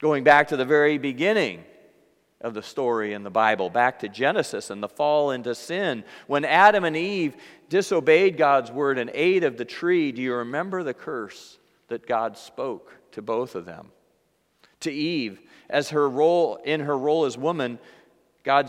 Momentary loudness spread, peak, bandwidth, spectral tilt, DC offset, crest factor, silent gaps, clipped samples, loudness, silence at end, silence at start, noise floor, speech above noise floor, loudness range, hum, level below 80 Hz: 16 LU; -2 dBFS; 14 kHz; -5 dB/octave; under 0.1%; 22 dB; none; under 0.1%; -23 LUFS; 0 s; 0 s; -68 dBFS; 45 dB; 11 LU; none; -72 dBFS